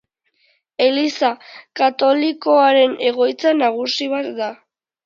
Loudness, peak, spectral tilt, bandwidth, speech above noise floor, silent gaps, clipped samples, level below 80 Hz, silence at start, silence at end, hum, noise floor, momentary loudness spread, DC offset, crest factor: -17 LUFS; -2 dBFS; -3 dB/octave; 7.4 kHz; 46 dB; none; under 0.1%; -74 dBFS; 0.8 s; 0.5 s; none; -63 dBFS; 13 LU; under 0.1%; 16 dB